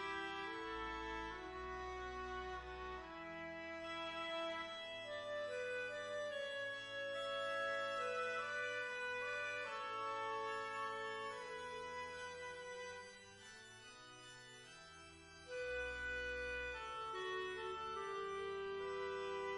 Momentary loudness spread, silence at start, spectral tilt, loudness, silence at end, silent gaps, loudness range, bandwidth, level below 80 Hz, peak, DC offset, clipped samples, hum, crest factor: 14 LU; 0 s; -3 dB/octave; -45 LUFS; 0 s; none; 8 LU; 11 kHz; -66 dBFS; -32 dBFS; under 0.1%; under 0.1%; none; 14 dB